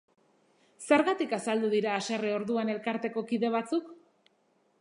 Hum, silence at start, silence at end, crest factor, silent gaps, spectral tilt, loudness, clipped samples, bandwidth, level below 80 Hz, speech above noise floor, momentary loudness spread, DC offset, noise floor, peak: none; 0.8 s; 0.85 s; 22 dB; none; -4.5 dB/octave; -30 LUFS; under 0.1%; 11 kHz; -80 dBFS; 41 dB; 8 LU; under 0.1%; -70 dBFS; -8 dBFS